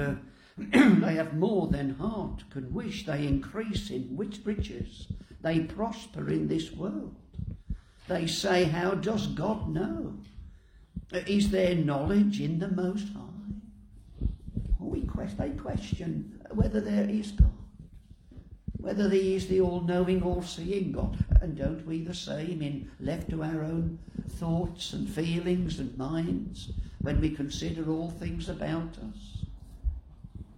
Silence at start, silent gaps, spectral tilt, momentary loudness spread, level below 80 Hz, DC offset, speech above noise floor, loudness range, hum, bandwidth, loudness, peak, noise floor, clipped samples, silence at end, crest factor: 0 s; none; -6.5 dB/octave; 15 LU; -38 dBFS; under 0.1%; 24 dB; 6 LU; none; 16 kHz; -30 LUFS; -8 dBFS; -53 dBFS; under 0.1%; 0 s; 22 dB